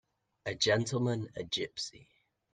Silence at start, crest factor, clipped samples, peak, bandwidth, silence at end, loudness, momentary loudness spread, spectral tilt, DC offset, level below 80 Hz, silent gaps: 0.45 s; 20 dB; under 0.1%; -16 dBFS; 9.8 kHz; 0.5 s; -33 LUFS; 12 LU; -4 dB/octave; under 0.1%; -66 dBFS; none